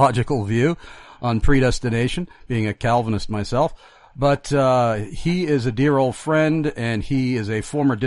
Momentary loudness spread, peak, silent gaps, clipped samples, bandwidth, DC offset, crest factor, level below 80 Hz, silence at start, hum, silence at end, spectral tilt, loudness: 7 LU; -4 dBFS; none; under 0.1%; 11.5 kHz; under 0.1%; 16 dB; -32 dBFS; 0 s; none; 0 s; -6.5 dB/octave; -21 LUFS